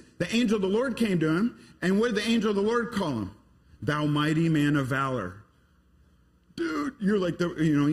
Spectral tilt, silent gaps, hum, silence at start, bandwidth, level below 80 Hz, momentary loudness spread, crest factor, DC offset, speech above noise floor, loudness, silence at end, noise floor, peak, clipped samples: -6.5 dB/octave; none; none; 0.2 s; 14 kHz; -56 dBFS; 8 LU; 14 dB; under 0.1%; 36 dB; -27 LUFS; 0 s; -62 dBFS; -12 dBFS; under 0.1%